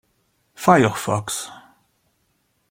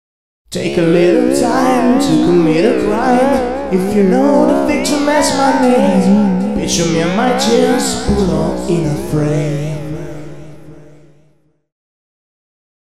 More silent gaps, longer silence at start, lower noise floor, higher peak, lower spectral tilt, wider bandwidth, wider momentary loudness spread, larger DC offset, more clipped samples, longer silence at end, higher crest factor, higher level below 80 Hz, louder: neither; first, 0.6 s vs 0.45 s; first, -68 dBFS vs -55 dBFS; about the same, -2 dBFS vs -2 dBFS; about the same, -5 dB/octave vs -5.5 dB/octave; first, 16.5 kHz vs 14.5 kHz; first, 13 LU vs 8 LU; second, under 0.1% vs 3%; neither; about the same, 1.1 s vs 1.1 s; first, 22 dB vs 12 dB; second, -58 dBFS vs -36 dBFS; second, -19 LUFS vs -13 LUFS